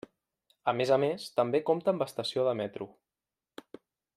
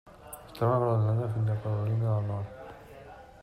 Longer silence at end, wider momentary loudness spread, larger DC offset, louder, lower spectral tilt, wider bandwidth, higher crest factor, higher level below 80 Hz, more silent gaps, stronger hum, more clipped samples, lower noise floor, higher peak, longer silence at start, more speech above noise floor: first, 1.3 s vs 0.2 s; second, 17 LU vs 22 LU; neither; about the same, -30 LUFS vs -29 LUFS; second, -5.5 dB/octave vs -8.5 dB/octave; about the same, 14.5 kHz vs 14 kHz; first, 20 dB vs 14 dB; second, -76 dBFS vs -58 dBFS; neither; neither; neither; first, under -90 dBFS vs -49 dBFS; first, -12 dBFS vs -16 dBFS; first, 0.65 s vs 0.05 s; first, over 61 dB vs 21 dB